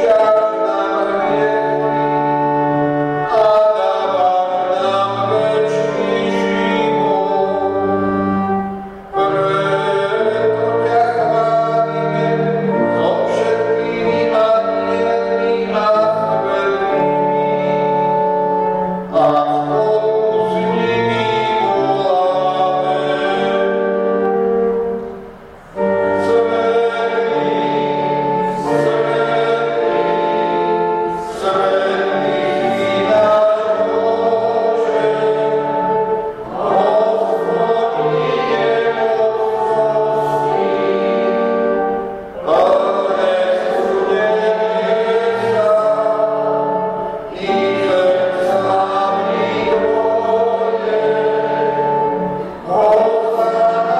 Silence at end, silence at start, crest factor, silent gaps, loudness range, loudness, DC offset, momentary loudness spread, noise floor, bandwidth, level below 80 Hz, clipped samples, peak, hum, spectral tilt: 0 s; 0 s; 12 dB; none; 2 LU; -16 LUFS; under 0.1%; 4 LU; -36 dBFS; 9.8 kHz; -52 dBFS; under 0.1%; -4 dBFS; none; -6.5 dB/octave